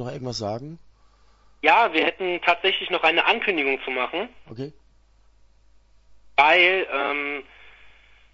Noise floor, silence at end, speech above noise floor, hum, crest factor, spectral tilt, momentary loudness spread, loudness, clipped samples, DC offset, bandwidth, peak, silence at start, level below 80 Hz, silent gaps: -57 dBFS; 0.45 s; 34 dB; none; 22 dB; -4 dB/octave; 19 LU; -21 LUFS; under 0.1%; under 0.1%; 8 kHz; -2 dBFS; 0 s; -58 dBFS; none